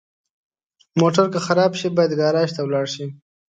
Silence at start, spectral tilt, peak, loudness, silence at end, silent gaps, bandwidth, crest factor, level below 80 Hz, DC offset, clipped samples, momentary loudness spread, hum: 0.95 s; -6 dB/octave; -2 dBFS; -19 LUFS; 0.45 s; none; 9.2 kHz; 18 dB; -66 dBFS; under 0.1%; under 0.1%; 10 LU; none